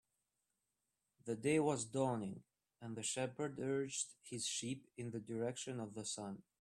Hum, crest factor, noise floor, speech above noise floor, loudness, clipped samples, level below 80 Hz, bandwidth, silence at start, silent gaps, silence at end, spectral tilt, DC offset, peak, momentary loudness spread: none; 20 dB; -89 dBFS; 47 dB; -42 LUFS; under 0.1%; -80 dBFS; 13.5 kHz; 1.25 s; none; 0.2 s; -4 dB/octave; under 0.1%; -24 dBFS; 12 LU